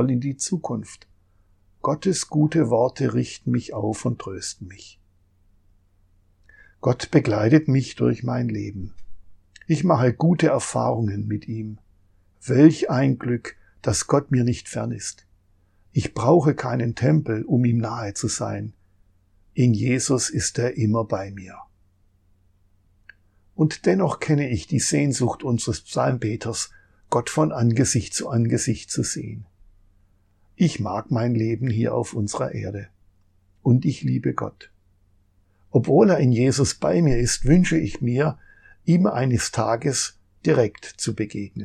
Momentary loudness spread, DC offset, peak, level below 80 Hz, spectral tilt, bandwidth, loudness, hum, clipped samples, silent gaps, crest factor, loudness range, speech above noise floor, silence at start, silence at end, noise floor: 13 LU; under 0.1%; -2 dBFS; -46 dBFS; -6 dB/octave; 13 kHz; -22 LUFS; none; under 0.1%; none; 22 dB; 6 LU; 39 dB; 0 s; 0 s; -60 dBFS